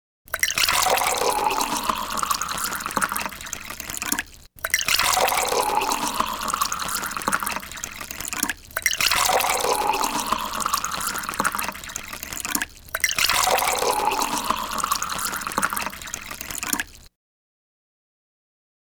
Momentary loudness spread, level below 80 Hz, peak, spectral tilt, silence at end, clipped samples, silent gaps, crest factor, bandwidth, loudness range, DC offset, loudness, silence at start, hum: 12 LU; -48 dBFS; 0 dBFS; -0.5 dB/octave; 1.85 s; under 0.1%; none; 24 dB; over 20 kHz; 4 LU; under 0.1%; -23 LUFS; 0.3 s; none